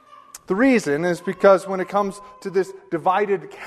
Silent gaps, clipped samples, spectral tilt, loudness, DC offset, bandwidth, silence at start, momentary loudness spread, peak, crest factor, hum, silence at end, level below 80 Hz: none; under 0.1%; -6 dB/octave; -20 LUFS; under 0.1%; 13.5 kHz; 0.35 s; 11 LU; -2 dBFS; 20 dB; none; 0 s; -60 dBFS